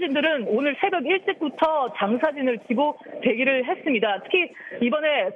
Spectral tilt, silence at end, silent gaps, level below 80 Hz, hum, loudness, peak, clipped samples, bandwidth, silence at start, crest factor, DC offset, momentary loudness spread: -6.5 dB/octave; 0 s; none; -72 dBFS; none; -23 LUFS; -6 dBFS; under 0.1%; 5.8 kHz; 0 s; 18 dB; under 0.1%; 5 LU